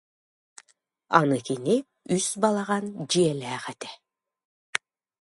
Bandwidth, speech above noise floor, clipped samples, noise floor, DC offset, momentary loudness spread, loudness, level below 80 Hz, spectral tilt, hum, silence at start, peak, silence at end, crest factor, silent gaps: 11.5 kHz; 39 dB; under 0.1%; -64 dBFS; under 0.1%; 12 LU; -26 LUFS; -72 dBFS; -4.5 dB/octave; none; 1.1 s; -2 dBFS; 0.45 s; 26 dB; 4.45-4.73 s